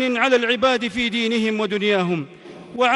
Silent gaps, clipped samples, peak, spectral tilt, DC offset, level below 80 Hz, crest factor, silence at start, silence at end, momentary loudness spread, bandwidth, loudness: none; under 0.1%; -4 dBFS; -4.5 dB/octave; under 0.1%; -56 dBFS; 16 dB; 0 s; 0 s; 9 LU; 11.5 kHz; -20 LUFS